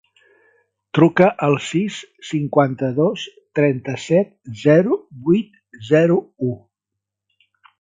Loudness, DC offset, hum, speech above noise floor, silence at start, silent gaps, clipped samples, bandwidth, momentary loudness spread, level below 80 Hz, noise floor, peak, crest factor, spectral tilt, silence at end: -18 LUFS; under 0.1%; 50 Hz at -45 dBFS; 65 dB; 0.95 s; none; under 0.1%; 9.4 kHz; 12 LU; -60 dBFS; -82 dBFS; 0 dBFS; 18 dB; -7 dB/octave; 1.25 s